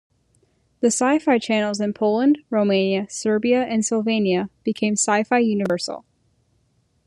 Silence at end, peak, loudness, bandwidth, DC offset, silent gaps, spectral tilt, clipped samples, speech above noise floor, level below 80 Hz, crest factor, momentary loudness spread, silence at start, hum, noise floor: 1.05 s; -6 dBFS; -20 LUFS; 11.5 kHz; under 0.1%; none; -4.5 dB/octave; under 0.1%; 45 dB; -66 dBFS; 16 dB; 5 LU; 0.8 s; none; -65 dBFS